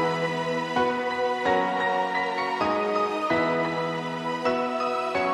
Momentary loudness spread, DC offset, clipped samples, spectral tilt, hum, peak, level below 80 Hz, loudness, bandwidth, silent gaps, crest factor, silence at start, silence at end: 4 LU; under 0.1%; under 0.1%; -5 dB/octave; none; -10 dBFS; -62 dBFS; -26 LUFS; 12.5 kHz; none; 16 dB; 0 s; 0 s